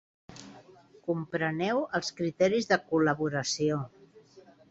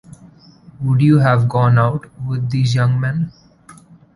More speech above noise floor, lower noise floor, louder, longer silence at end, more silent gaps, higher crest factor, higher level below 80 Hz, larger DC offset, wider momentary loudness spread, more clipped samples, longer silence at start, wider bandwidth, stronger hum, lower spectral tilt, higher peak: about the same, 28 dB vs 30 dB; first, -57 dBFS vs -45 dBFS; second, -29 LUFS vs -16 LUFS; second, 0.3 s vs 0.45 s; neither; first, 20 dB vs 14 dB; second, -68 dBFS vs -48 dBFS; neither; first, 17 LU vs 12 LU; neither; second, 0.3 s vs 0.8 s; second, 8.2 kHz vs 11 kHz; neither; second, -5 dB/octave vs -8 dB/octave; second, -12 dBFS vs -2 dBFS